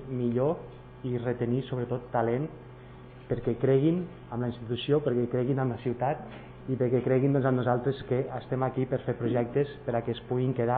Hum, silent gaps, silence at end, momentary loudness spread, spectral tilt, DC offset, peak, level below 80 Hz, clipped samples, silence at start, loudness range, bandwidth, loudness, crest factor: none; none; 0 s; 12 LU; -7.5 dB/octave; under 0.1%; -12 dBFS; -56 dBFS; under 0.1%; 0 s; 3 LU; 4.4 kHz; -29 LUFS; 18 dB